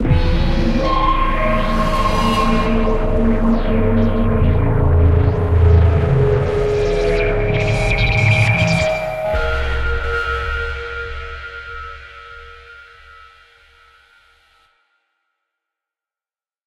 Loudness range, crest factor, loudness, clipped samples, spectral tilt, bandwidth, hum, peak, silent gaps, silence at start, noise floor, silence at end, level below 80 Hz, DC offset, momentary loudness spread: 14 LU; 14 dB; -17 LUFS; under 0.1%; -7 dB/octave; 11.5 kHz; none; -2 dBFS; none; 0 s; under -90 dBFS; 3.85 s; -22 dBFS; under 0.1%; 16 LU